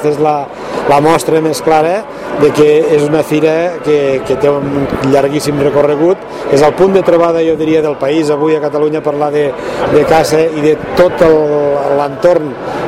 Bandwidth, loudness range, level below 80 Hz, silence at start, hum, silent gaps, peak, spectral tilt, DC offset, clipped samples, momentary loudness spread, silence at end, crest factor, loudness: 15.5 kHz; 1 LU; -40 dBFS; 0 s; none; none; 0 dBFS; -6 dB/octave; under 0.1%; 0.4%; 6 LU; 0 s; 10 dB; -11 LUFS